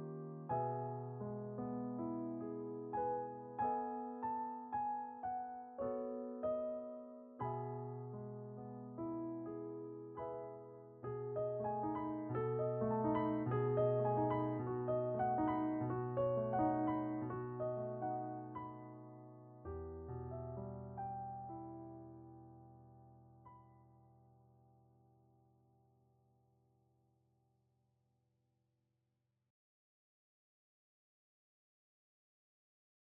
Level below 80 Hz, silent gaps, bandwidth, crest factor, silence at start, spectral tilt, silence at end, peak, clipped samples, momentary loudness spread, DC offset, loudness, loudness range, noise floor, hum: -72 dBFS; none; 3.4 kHz; 18 dB; 0 s; -9 dB/octave; 9.15 s; -24 dBFS; under 0.1%; 16 LU; under 0.1%; -42 LUFS; 12 LU; -86 dBFS; 50 Hz at -85 dBFS